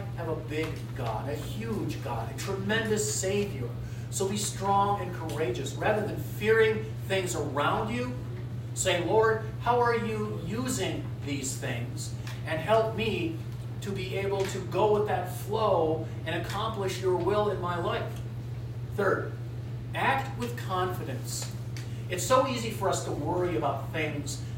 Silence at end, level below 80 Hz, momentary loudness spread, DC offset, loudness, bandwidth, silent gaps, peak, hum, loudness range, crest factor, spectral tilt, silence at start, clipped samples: 0 s; -50 dBFS; 10 LU; under 0.1%; -30 LUFS; 16 kHz; none; -10 dBFS; none; 3 LU; 20 dB; -5 dB/octave; 0 s; under 0.1%